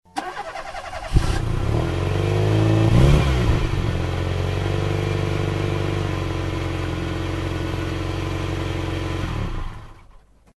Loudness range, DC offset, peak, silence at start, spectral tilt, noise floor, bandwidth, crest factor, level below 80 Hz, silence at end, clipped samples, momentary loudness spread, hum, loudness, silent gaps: 6 LU; under 0.1%; -2 dBFS; 0.15 s; -6.5 dB/octave; -49 dBFS; 12 kHz; 18 dB; -28 dBFS; 0.6 s; under 0.1%; 13 LU; none; -23 LUFS; none